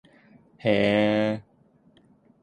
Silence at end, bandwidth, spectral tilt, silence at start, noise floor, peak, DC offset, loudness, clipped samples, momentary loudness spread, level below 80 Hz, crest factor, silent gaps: 1 s; 9.4 kHz; -7 dB/octave; 0.65 s; -60 dBFS; -8 dBFS; under 0.1%; -24 LUFS; under 0.1%; 9 LU; -60 dBFS; 20 dB; none